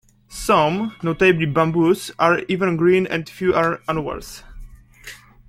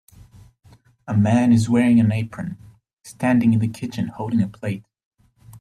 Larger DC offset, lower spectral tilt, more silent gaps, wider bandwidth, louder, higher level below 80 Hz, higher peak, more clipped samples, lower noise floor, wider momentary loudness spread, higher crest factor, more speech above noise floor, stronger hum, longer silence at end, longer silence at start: neither; second, -6 dB/octave vs -7.5 dB/octave; second, none vs 2.93-2.97 s, 5.05-5.11 s; first, 15.5 kHz vs 12.5 kHz; about the same, -19 LUFS vs -20 LUFS; first, -44 dBFS vs -54 dBFS; first, -2 dBFS vs -6 dBFS; neither; second, -42 dBFS vs -47 dBFS; first, 21 LU vs 14 LU; about the same, 18 dB vs 16 dB; second, 23 dB vs 29 dB; neither; first, 0.35 s vs 0.05 s; second, 0.3 s vs 1.05 s